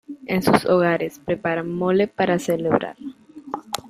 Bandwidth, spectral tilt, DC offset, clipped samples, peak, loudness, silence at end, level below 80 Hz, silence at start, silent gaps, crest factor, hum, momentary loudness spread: 16 kHz; -6 dB/octave; under 0.1%; under 0.1%; 0 dBFS; -21 LUFS; 0 s; -56 dBFS; 0.1 s; none; 22 dB; none; 16 LU